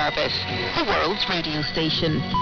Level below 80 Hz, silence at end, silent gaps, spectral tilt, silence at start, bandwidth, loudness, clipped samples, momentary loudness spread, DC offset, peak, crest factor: -42 dBFS; 0 s; none; -5.5 dB/octave; 0 s; 6.8 kHz; -23 LUFS; under 0.1%; 3 LU; under 0.1%; -8 dBFS; 16 dB